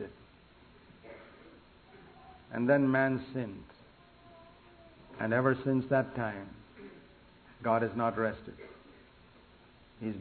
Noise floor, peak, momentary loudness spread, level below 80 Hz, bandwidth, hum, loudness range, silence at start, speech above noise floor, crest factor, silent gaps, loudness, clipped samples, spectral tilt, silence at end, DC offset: -59 dBFS; -12 dBFS; 24 LU; -64 dBFS; 4.5 kHz; none; 4 LU; 0 s; 29 dB; 22 dB; none; -32 LUFS; under 0.1%; -6.5 dB/octave; 0 s; under 0.1%